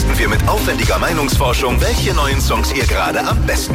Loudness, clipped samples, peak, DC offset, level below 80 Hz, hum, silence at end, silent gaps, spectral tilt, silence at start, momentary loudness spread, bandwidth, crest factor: -15 LUFS; under 0.1%; -2 dBFS; under 0.1%; -18 dBFS; none; 0 s; none; -4.5 dB/octave; 0 s; 1 LU; 16.5 kHz; 12 dB